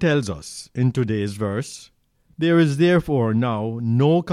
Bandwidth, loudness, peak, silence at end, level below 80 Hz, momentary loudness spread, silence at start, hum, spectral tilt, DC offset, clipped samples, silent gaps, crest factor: 12.5 kHz; -21 LUFS; -6 dBFS; 0 s; -50 dBFS; 13 LU; 0 s; none; -7 dB/octave; under 0.1%; under 0.1%; none; 14 dB